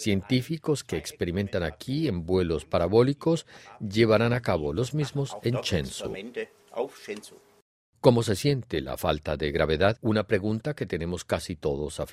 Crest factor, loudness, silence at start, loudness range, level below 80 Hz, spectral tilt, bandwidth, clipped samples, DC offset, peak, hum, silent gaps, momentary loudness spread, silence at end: 24 dB; -27 LUFS; 0 s; 4 LU; -50 dBFS; -6 dB/octave; 15 kHz; under 0.1%; under 0.1%; -4 dBFS; none; 7.62-7.93 s; 12 LU; 0 s